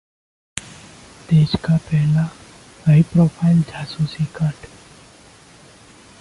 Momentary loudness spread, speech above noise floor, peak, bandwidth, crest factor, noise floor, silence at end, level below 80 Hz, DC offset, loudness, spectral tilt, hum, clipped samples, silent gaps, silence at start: 17 LU; 30 dB; -2 dBFS; 11.5 kHz; 18 dB; -46 dBFS; 1.55 s; -46 dBFS; under 0.1%; -18 LUFS; -7.5 dB/octave; none; under 0.1%; none; 0.55 s